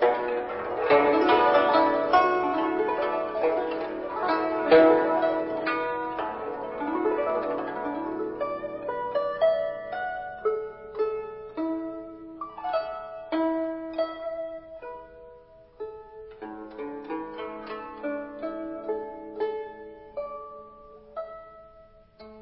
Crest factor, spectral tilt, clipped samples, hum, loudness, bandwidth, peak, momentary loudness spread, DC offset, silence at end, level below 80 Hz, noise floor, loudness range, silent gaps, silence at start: 20 dB; -9 dB/octave; under 0.1%; none; -27 LUFS; 5.8 kHz; -8 dBFS; 20 LU; under 0.1%; 0 s; -60 dBFS; -53 dBFS; 14 LU; none; 0 s